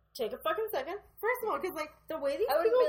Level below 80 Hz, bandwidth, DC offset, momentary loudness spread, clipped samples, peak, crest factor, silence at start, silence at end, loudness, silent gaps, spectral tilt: -66 dBFS; 17.5 kHz; under 0.1%; 10 LU; under 0.1%; -16 dBFS; 16 dB; 0.15 s; 0 s; -33 LUFS; none; -3.5 dB/octave